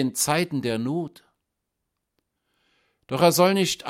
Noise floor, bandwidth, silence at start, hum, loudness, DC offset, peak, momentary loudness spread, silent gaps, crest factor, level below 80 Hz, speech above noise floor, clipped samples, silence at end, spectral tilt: -81 dBFS; 16.5 kHz; 0 s; none; -22 LUFS; under 0.1%; -4 dBFS; 13 LU; none; 22 dB; -64 dBFS; 58 dB; under 0.1%; 0 s; -4 dB/octave